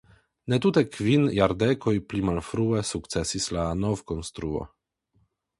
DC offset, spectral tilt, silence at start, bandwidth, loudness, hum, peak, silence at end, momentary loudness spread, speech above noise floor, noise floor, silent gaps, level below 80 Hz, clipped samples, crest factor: under 0.1%; -5.5 dB/octave; 0.45 s; 11.5 kHz; -26 LUFS; none; -6 dBFS; 0.95 s; 10 LU; 44 dB; -69 dBFS; none; -46 dBFS; under 0.1%; 20 dB